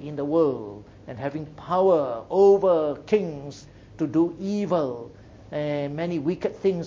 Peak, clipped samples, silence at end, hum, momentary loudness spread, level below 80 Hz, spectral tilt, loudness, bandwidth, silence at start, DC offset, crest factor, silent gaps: -6 dBFS; under 0.1%; 0 s; none; 18 LU; -56 dBFS; -8 dB/octave; -24 LUFS; 7.4 kHz; 0 s; under 0.1%; 18 dB; none